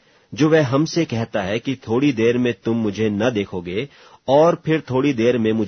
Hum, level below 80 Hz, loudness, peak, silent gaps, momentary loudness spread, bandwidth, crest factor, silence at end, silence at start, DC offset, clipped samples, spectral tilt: none; -56 dBFS; -19 LUFS; -4 dBFS; none; 10 LU; 6.6 kHz; 16 dB; 0 s; 0.3 s; under 0.1%; under 0.1%; -6.5 dB/octave